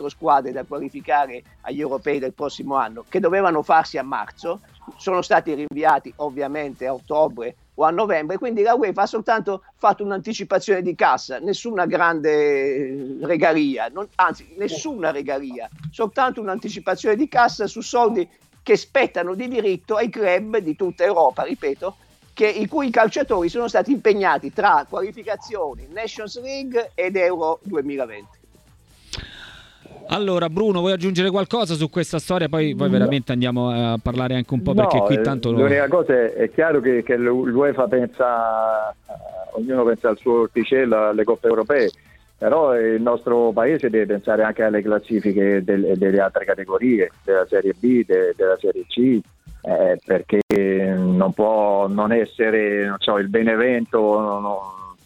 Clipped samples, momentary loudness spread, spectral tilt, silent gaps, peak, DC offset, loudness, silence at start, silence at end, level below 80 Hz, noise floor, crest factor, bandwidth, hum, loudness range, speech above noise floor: under 0.1%; 11 LU; -6 dB/octave; 50.42-50.49 s; -4 dBFS; under 0.1%; -20 LUFS; 0 s; 0.1 s; -52 dBFS; -53 dBFS; 16 dB; 12 kHz; none; 5 LU; 33 dB